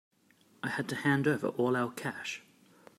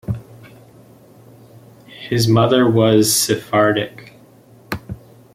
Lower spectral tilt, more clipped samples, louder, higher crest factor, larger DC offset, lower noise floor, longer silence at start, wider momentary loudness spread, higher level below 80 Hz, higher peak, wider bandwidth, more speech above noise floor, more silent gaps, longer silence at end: first, -6 dB/octave vs -4.5 dB/octave; neither; second, -32 LUFS vs -15 LUFS; about the same, 18 dB vs 18 dB; neither; first, -66 dBFS vs -46 dBFS; first, 0.65 s vs 0.1 s; second, 12 LU vs 17 LU; second, -76 dBFS vs -50 dBFS; second, -14 dBFS vs -2 dBFS; about the same, 15.5 kHz vs 16.5 kHz; about the same, 34 dB vs 32 dB; neither; first, 0.6 s vs 0.4 s